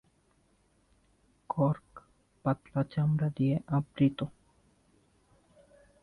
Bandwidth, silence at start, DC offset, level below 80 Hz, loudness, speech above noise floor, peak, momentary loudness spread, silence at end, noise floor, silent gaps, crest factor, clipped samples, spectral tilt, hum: 4.8 kHz; 1.5 s; under 0.1%; -64 dBFS; -31 LUFS; 40 dB; -16 dBFS; 9 LU; 1.75 s; -69 dBFS; none; 18 dB; under 0.1%; -10 dB/octave; none